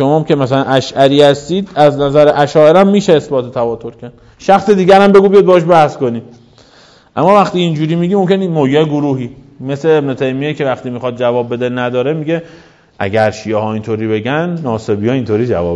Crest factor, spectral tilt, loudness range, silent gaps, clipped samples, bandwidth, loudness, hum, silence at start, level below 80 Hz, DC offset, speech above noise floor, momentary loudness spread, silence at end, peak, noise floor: 12 dB; -7 dB/octave; 7 LU; none; 1%; 11 kHz; -12 LUFS; none; 0 s; -46 dBFS; under 0.1%; 33 dB; 11 LU; 0 s; 0 dBFS; -44 dBFS